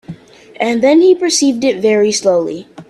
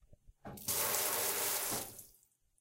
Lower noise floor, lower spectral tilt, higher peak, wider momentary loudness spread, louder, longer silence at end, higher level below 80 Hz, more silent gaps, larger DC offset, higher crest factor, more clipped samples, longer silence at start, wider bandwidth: second, -34 dBFS vs -70 dBFS; first, -3.5 dB/octave vs -0.5 dB/octave; first, 0 dBFS vs -20 dBFS; second, 8 LU vs 20 LU; first, -12 LUFS vs -34 LUFS; second, 0.05 s vs 0.5 s; first, -56 dBFS vs -68 dBFS; neither; neither; second, 12 dB vs 20 dB; neither; about the same, 0.1 s vs 0.1 s; second, 12.5 kHz vs 17 kHz